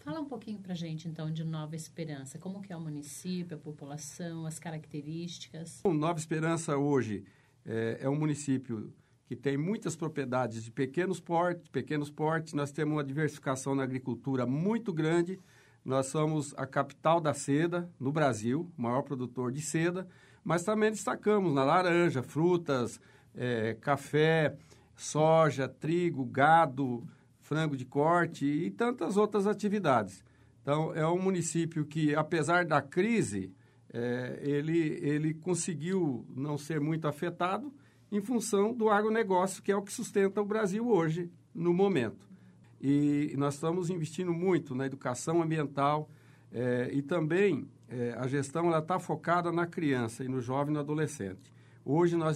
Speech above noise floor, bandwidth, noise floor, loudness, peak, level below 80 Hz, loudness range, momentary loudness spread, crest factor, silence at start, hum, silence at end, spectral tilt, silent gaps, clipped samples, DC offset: 25 dB; 14.5 kHz; -56 dBFS; -31 LUFS; -12 dBFS; -72 dBFS; 5 LU; 13 LU; 20 dB; 0.05 s; none; 0 s; -6 dB/octave; none; under 0.1%; under 0.1%